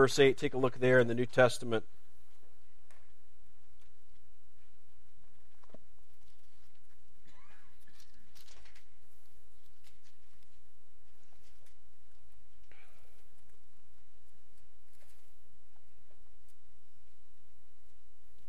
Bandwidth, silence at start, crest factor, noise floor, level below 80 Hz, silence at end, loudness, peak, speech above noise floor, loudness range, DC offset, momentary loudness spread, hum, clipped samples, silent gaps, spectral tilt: 15 kHz; 0 s; 26 dB; -70 dBFS; -68 dBFS; 16.7 s; -29 LUFS; -12 dBFS; 41 dB; 15 LU; 2%; 10 LU; none; under 0.1%; none; -5 dB/octave